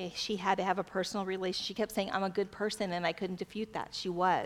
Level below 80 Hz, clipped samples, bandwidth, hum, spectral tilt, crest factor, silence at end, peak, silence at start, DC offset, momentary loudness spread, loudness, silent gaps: -66 dBFS; under 0.1%; 16.5 kHz; none; -4.5 dB/octave; 20 dB; 0 s; -14 dBFS; 0 s; under 0.1%; 7 LU; -34 LUFS; none